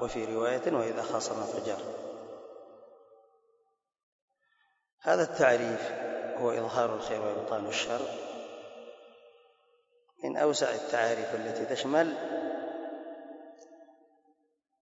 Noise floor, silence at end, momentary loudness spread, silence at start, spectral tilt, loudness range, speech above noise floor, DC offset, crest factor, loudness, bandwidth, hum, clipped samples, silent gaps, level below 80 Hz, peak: -76 dBFS; 0.9 s; 19 LU; 0 s; -4 dB/octave; 8 LU; 46 dB; under 0.1%; 24 dB; -31 LUFS; 8 kHz; none; under 0.1%; 4.03-4.28 s, 4.93-4.98 s; -70 dBFS; -10 dBFS